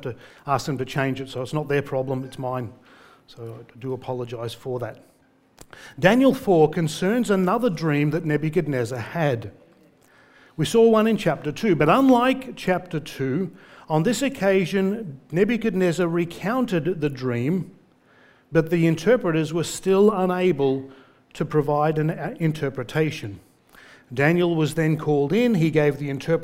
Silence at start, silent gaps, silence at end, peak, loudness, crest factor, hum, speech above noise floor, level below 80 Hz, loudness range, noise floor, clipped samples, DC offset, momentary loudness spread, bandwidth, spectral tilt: 0 s; none; 0 s; -2 dBFS; -22 LUFS; 20 dB; none; 34 dB; -54 dBFS; 8 LU; -56 dBFS; under 0.1%; under 0.1%; 13 LU; 16 kHz; -6.5 dB/octave